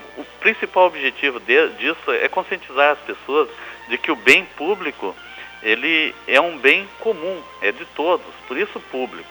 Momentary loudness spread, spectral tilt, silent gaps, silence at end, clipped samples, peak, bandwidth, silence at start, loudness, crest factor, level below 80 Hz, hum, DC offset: 13 LU; -3 dB/octave; none; 0 s; under 0.1%; 0 dBFS; over 20 kHz; 0 s; -19 LUFS; 20 dB; -60 dBFS; none; under 0.1%